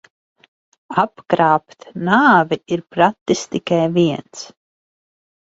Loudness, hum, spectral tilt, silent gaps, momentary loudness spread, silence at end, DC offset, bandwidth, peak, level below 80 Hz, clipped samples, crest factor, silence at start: -17 LUFS; none; -5.5 dB/octave; 3.21-3.26 s; 17 LU; 1.15 s; under 0.1%; 8 kHz; 0 dBFS; -60 dBFS; under 0.1%; 18 dB; 0.9 s